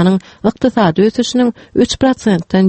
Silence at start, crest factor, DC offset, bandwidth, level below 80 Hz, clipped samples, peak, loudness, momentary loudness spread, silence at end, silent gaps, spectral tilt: 0 s; 12 dB; under 0.1%; 8.6 kHz; -42 dBFS; under 0.1%; 0 dBFS; -14 LUFS; 4 LU; 0 s; none; -6 dB/octave